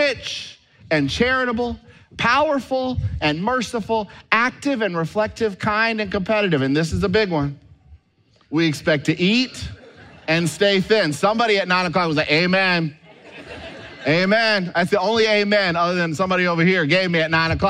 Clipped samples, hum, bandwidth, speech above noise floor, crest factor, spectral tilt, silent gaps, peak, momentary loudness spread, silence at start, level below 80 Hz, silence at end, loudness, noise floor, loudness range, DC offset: under 0.1%; none; 14 kHz; 39 dB; 18 dB; -5 dB/octave; none; -2 dBFS; 10 LU; 0 s; -44 dBFS; 0 s; -19 LUFS; -59 dBFS; 4 LU; under 0.1%